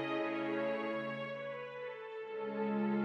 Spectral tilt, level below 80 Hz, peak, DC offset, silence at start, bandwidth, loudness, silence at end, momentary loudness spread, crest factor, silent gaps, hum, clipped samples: -7.5 dB/octave; under -90 dBFS; -24 dBFS; under 0.1%; 0 s; 7 kHz; -39 LUFS; 0 s; 8 LU; 14 dB; none; none; under 0.1%